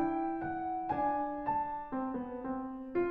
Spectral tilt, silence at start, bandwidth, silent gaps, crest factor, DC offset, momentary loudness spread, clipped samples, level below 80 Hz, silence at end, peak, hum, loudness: -9.5 dB/octave; 0 s; 4.5 kHz; none; 14 dB; under 0.1%; 6 LU; under 0.1%; -60 dBFS; 0 s; -22 dBFS; none; -36 LUFS